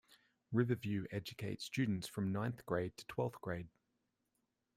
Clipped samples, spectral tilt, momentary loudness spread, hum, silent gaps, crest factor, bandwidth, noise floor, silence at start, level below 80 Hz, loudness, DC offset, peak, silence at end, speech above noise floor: under 0.1%; -6.5 dB/octave; 8 LU; none; none; 22 dB; 16 kHz; -85 dBFS; 0.1 s; -70 dBFS; -41 LUFS; under 0.1%; -20 dBFS; 1.1 s; 46 dB